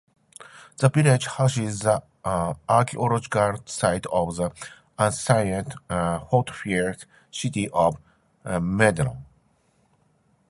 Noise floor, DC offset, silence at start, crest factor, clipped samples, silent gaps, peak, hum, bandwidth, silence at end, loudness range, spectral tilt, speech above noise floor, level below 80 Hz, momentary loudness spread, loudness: -64 dBFS; under 0.1%; 0.4 s; 22 dB; under 0.1%; none; -2 dBFS; none; 11.5 kHz; 1.25 s; 3 LU; -5.5 dB/octave; 41 dB; -50 dBFS; 17 LU; -24 LUFS